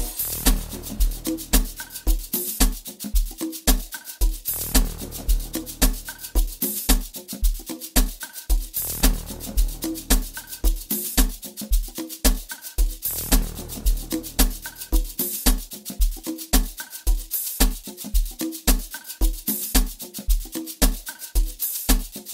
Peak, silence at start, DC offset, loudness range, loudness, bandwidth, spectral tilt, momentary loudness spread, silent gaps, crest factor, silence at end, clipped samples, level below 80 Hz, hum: -2 dBFS; 0 s; under 0.1%; 1 LU; -25 LUFS; 16.5 kHz; -3 dB/octave; 10 LU; none; 20 dB; 0 s; under 0.1%; -24 dBFS; none